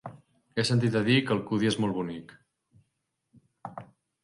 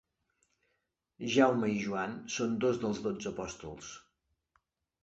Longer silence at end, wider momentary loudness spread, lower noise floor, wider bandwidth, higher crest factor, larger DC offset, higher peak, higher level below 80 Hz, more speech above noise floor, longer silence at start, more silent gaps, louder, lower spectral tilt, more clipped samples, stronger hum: second, 0.4 s vs 1.05 s; first, 21 LU vs 18 LU; about the same, -80 dBFS vs -82 dBFS; first, 11.5 kHz vs 8.2 kHz; about the same, 18 dB vs 22 dB; neither; about the same, -12 dBFS vs -12 dBFS; about the same, -66 dBFS vs -66 dBFS; first, 54 dB vs 50 dB; second, 0.05 s vs 1.2 s; neither; first, -27 LUFS vs -32 LUFS; about the same, -6 dB/octave vs -5 dB/octave; neither; neither